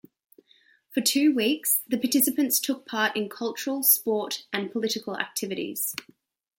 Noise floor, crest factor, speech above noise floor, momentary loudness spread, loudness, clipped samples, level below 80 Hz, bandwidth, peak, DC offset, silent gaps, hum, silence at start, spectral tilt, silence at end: -62 dBFS; 22 dB; 36 dB; 9 LU; -25 LUFS; under 0.1%; -76 dBFS; 17 kHz; -6 dBFS; under 0.1%; none; none; 0.9 s; -2 dB/octave; 0.6 s